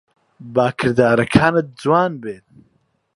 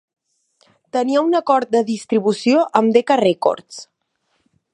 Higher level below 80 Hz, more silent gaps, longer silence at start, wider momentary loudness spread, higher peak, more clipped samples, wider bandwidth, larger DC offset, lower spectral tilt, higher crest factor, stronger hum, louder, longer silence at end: first, -48 dBFS vs -70 dBFS; neither; second, 0.4 s vs 0.95 s; first, 16 LU vs 10 LU; about the same, 0 dBFS vs 0 dBFS; neither; about the same, 11.5 kHz vs 11 kHz; neither; first, -7 dB/octave vs -5.5 dB/octave; about the same, 18 dB vs 18 dB; neither; about the same, -17 LUFS vs -17 LUFS; about the same, 0.8 s vs 0.9 s